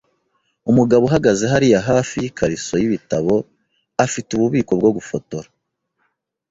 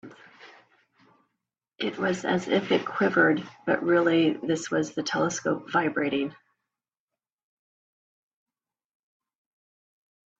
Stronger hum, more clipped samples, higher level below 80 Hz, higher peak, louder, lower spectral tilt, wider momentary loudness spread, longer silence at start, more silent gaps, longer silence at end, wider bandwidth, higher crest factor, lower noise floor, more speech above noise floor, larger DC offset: neither; neither; first, -48 dBFS vs -72 dBFS; first, -2 dBFS vs -8 dBFS; first, -18 LUFS vs -26 LUFS; about the same, -6 dB/octave vs -5 dB/octave; first, 13 LU vs 7 LU; first, 0.65 s vs 0.05 s; neither; second, 1.1 s vs 4.05 s; about the same, 8 kHz vs 8 kHz; about the same, 16 dB vs 20 dB; second, -71 dBFS vs under -90 dBFS; second, 54 dB vs over 65 dB; neither